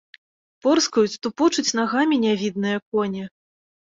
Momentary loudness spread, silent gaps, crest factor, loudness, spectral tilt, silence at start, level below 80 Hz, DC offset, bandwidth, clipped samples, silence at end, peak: 7 LU; 2.82-2.92 s; 16 dB; -21 LUFS; -4 dB/octave; 0.65 s; -66 dBFS; under 0.1%; 7.8 kHz; under 0.1%; 0.7 s; -6 dBFS